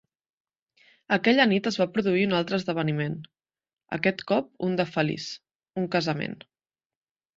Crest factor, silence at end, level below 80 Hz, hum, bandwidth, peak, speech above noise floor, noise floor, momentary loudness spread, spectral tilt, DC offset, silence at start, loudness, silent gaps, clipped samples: 22 dB; 1.05 s; -68 dBFS; none; 7.8 kHz; -6 dBFS; over 65 dB; under -90 dBFS; 14 LU; -6 dB/octave; under 0.1%; 1.1 s; -26 LUFS; none; under 0.1%